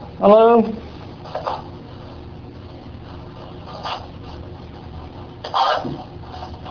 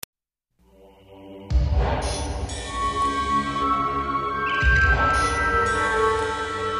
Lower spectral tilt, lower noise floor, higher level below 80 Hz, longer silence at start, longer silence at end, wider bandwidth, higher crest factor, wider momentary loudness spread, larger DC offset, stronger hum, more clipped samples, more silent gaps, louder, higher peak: first, -7 dB/octave vs -4.5 dB/octave; second, -36 dBFS vs -69 dBFS; second, -44 dBFS vs -30 dBFS; second, 0 s vs 1.1 s; about the same, 0 s vs 0 s; second, 5.4 kHz vs 15 kHz; about the same, 22 dB vs 18 dB; first, 23 LU vs 10 LU; neither; neither; neither; neither; first, -18 LUFS vs -22 LUFS; first, 0 dBFS vs -4 dBFS